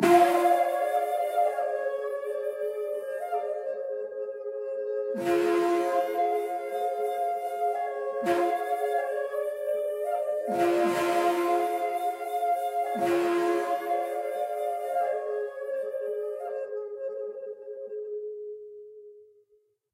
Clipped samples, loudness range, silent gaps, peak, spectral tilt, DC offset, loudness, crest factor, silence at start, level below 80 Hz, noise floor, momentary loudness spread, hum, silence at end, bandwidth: under 0.1%; 7 LU; none; -8 dBFS; -4.5 dB/octave; under 0.1%; -29 LUFS; 20 dB; 0 s; -78 dBFS; -67 dBFS; 11 LU; none; 0.7 s; 16 kHz